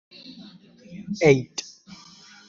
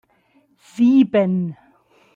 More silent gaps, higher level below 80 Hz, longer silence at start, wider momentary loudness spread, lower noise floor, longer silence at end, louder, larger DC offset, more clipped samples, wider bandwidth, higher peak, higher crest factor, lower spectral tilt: neither; first, -60 dBFS vs -66 dBFS; second, 0.3 s vs 0.75 s; first, 26 LU vs 15 LU; second, -49 dBFS vs -59 dBFS; first, 0.85 s vs 0.6 s; second, -22 LUFS vs -17 LUFS; neither; neither; about the same, 7.6 kHz vs 7.6 kHz; about the same, -4 dBFS vs -6 dBFS; first, 22 dB vs 14 dB; second, -5.5 dB/octave vs -8.5 dB/octave